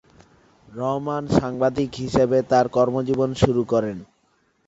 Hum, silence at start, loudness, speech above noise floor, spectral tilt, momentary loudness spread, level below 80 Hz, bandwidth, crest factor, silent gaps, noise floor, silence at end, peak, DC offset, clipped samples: none; 0.7 s; -22 LUFS; 44 dB; -7 dB/octave; 9 LU; -46 dBFS; 8 kHz; 20 dB; none; -65 dBFS; 0.65 s; -2 dBFS; under 0.1%; under 0.1%